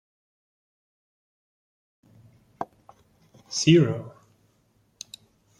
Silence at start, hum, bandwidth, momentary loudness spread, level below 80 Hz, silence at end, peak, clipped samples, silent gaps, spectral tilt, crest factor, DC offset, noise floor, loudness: 2.6 s; none; 11 kHz; 26 LU; -66 dBFS; 1.5 s; -6 dBFS; under 0.1%; none; -5.5 dB/octave; 24 dB; under 0.1%; -66 dBFS; -22 LUFS